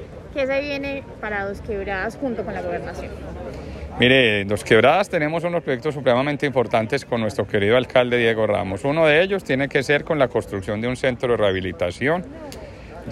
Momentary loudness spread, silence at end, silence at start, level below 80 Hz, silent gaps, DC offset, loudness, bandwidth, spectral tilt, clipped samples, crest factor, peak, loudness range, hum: 17 LU; 0 s; 0 s; -44 dBFS; none; under 0.1%; -20 LUFS; 13 kHz; -5.5 dB/octave; under 0.1%; 18 dB; -4 dBFS; 7 LU; none